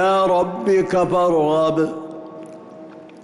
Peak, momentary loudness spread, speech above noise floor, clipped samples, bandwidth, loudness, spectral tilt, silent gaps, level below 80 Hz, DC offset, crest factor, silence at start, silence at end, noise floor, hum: -8 dBFS; 22 LU; 22 dB; under 0.1%; 12 kHz; -18 LUFS; -6.5 dB/octave; none; -54 dBFS; under 0.1%; 10 dB; 0 s; 0 s; -39 dBFS; none